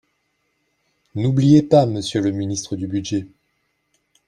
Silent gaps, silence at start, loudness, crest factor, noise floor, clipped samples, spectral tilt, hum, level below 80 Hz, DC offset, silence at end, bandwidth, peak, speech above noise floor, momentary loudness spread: none; 1.15 s; -19 LUFS; 20 dB; -70 dBFS; under 0.1%; -6.5 dB/octave; none; -56 dBFS; under 0.1%; 1 s; 10.5 kHz; -2 dBFS; 52 dB; 13 LU